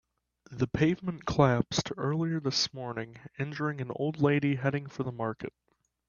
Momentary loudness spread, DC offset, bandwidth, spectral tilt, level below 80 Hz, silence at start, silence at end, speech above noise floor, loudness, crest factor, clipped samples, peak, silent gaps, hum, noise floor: 12 LU; under 0.1%; 7.2 kHz; -5.5 dB/octave; -58 dBFS; 0.5 s; 0.6 s; 28 dB; -30 LUFS; 22 dB; under 0.1%; -8 dBFS; none; none; -58 dBFS